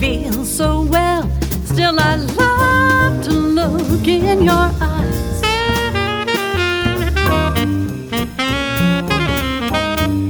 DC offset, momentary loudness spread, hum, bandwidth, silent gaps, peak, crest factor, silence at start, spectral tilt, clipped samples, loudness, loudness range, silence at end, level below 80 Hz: under 0.1%; 6 LU; none; over 20 kHz; none; 0 dBFS; 14 dB; 0 s; -5 dB/octave; under 0.1%; -16 LUFS; 3 LU; 0 s; -26 dBFS